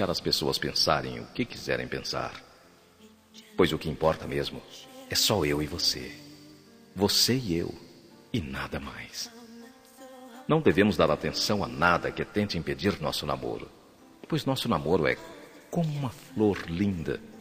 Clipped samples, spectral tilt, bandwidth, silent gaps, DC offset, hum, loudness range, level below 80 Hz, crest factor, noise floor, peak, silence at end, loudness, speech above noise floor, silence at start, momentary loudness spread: under 0.1%; -4.5 dB/octave; 15.5 kHz; none; under 0.1%; none; 5 LU; -52 dBFS; 24 dB; -57 dBFS; -6 dBFS; 0 s; -28 LUFS; 29 dB; 0 s; 19 LU